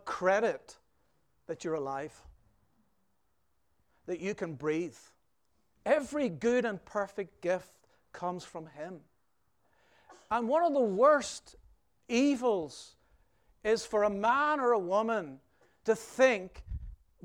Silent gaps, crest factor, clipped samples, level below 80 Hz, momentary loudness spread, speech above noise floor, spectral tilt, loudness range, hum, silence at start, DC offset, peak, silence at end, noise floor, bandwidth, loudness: none; 20 dB; under 0.1%; -58 dBFS; 18 LU; 48 dB; -5 dB/octave; 11 LU; none; 0.05 s; under 0.1%; -12 dBFS; 0.3 s; -79 dBFS; 15 kHz; -31 LUFS